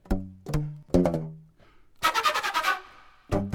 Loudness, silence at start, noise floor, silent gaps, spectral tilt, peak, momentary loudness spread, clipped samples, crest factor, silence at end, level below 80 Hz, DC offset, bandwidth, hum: -27 LUFS; 0.05 s; -56 dBFS; none; -5 dB/octave; -8 dBFS; 9 LU; under 0.1%; 20 dB; 0 s; -40 dBFS; under 0.1%; 18.5 kHz; none